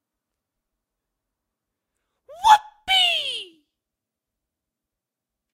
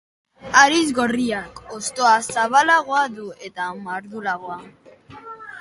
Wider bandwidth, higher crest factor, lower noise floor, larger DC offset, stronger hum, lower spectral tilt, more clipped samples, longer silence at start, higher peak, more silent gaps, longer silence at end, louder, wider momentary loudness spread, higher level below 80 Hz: first, 16 kHz vs 11.5 kHz; first, 26 dB vs 20 dB; first, -86 dBFS vs -42 dBFS; neither; neither; second, 1.5 dB/octave vs -2 dB/octave; neither; first, 2.3 s vs 0.45 s; about the same, 0 dBFS vs 0 dBFS; neither; first, 2.1 s vs 0 s; about the same, -19 LUFS vs -19 LUFS; second, 11 LU vs 20 LU; about the same, -62 dBFS vs -58 dBFS